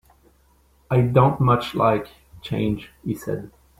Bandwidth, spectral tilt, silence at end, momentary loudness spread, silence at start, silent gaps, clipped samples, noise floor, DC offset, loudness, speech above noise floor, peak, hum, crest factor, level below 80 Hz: 14.5 kHz; -8 dB/octave; 0.3 s; 14 LU; 0.9 s; none; under 0.1%; -58 dBFS; under 0.1%; -22 LUFS; 38 dB; -4 dBFS; none; 18 dB; -48 dBFS